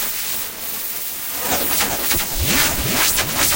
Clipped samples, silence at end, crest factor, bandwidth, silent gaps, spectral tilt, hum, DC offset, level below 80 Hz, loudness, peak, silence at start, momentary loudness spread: under 0.1%; 0 s; 16 dB; 16.5 kHz; none; -1.5 dB/octave; none; under 0.1%; -34 dBFS; -17 LUFS; -4 dBFS; 0 s; 7 LU